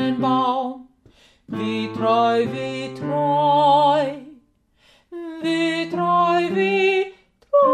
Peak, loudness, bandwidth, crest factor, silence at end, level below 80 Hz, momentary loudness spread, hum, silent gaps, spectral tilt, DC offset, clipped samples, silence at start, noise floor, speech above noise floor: -6 dBFS; -20 LUFS; 10 kHz; 14 dB; 0 s; -64 dBFS; 14 LU; none; none; -6 dB/octave; under 0.1%; under 0.1%; 0 s; -60 dBFS; 40 dB